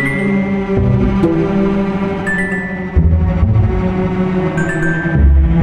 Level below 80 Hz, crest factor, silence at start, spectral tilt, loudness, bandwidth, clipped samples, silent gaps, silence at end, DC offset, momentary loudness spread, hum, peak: -18 dBFS; 12 dB; 0 s; -8.5 dB/octave; -15 LUFS; 10 kHz; under 0.1%; none; 0 s; under 0.1%; 4 LU; none; 0 dBFS